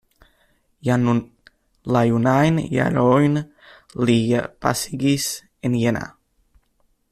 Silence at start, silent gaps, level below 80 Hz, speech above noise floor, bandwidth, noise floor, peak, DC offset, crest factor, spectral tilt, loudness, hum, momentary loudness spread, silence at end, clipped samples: 0.85 s; none; -52 dBFS; 46 dB; 14.5 kHz; -64 dBFS; -4 dBFS; under 0.1%; 18 dB; -6 dB/octave; -20 LUFS; none; 11 LU; 1.05 s; under 0.1%